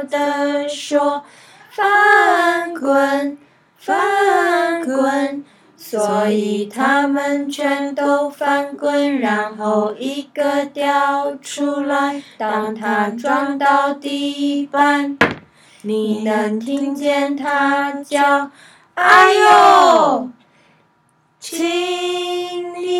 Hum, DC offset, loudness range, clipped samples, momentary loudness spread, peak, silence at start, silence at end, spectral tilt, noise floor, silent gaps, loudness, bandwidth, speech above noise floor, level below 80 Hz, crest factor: none; under 0.1%; 6 LU; under 0.1%; 13 LU; 0 dBFS; 0 s; 0 s; -3.5 dB/octave; -59 dBFS; none; -16 LUFS; 16.5 kHz; 42 dB; -64 dBFS; 16 dB